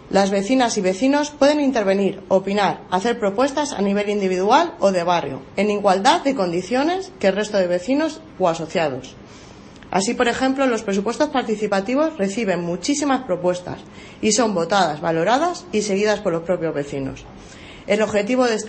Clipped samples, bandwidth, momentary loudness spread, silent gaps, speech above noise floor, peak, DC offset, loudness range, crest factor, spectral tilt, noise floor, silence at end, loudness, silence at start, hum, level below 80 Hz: under 0.1%; 8.8 kHz; 8 LU; none; 22 dB; -2 dBFS; under 0.1%; 3 LU; 18 dB; -4.5 dB/octave; -41 dBFS; 0 s; -20 LUFS; 0 s; none; -52 dBFS